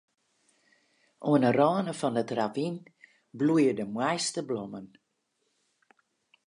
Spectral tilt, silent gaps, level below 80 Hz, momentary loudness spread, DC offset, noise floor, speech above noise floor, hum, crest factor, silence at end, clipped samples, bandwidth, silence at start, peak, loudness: -5.5 dB/octave; none; -78 dBFS; 12 LU; under 0.1%; -77 dBFS; 50 dB; none; 20 dB; 1.6 s; under 0.1%; 11.5 kHz; 1.2 s; -10 dBFS; -28 LUFS